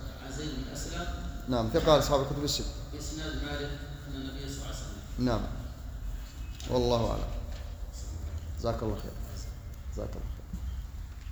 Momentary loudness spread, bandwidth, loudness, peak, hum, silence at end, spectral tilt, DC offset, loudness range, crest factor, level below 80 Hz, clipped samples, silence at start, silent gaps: 14 LU; over 20 kHz; -34 LUFS; -8 dBFS; none; 0 s; -5 dB/octave; under 0.1%; 8 LU; 24 dB; -38 dBFS; under 0.1%; 0 s; none